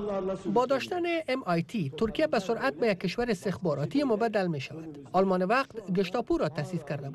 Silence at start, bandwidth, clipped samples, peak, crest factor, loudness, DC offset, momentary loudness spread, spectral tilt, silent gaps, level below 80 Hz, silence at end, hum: 0 s; 13 kHz; under 0.1%; -16 dBFS; 14 dB; -29 LUFS; under 0.1%; 6 LU; -6.5 dB/octave; none; -56 dBFS; 0 s; none